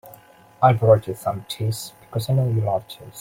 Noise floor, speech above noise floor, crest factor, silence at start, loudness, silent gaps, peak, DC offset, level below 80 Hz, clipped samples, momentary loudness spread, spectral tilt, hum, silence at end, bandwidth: -49 dBFS; 28 dB; 20 dB; 0.05 s; -21 LUFS; none; -2 dBFS; under 0.1%; -54 dBFS; under 0.1%; 13 LU; -6.5 dB/octave; none; 0 s; 16.5 kHz